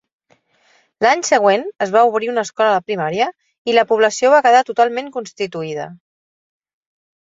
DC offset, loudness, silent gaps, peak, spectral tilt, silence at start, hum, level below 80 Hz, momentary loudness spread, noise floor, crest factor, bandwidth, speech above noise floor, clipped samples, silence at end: under 0.1%; -16 LUFS; 3.58-3.65 s; -2 dBFS; -3.5 dB/octave; 1 s; none; -66 dBFS; 13 LU; -58 dBFS; 16 dB; 7.8 kHz; 43 dB; under 0.1%; 1.3 s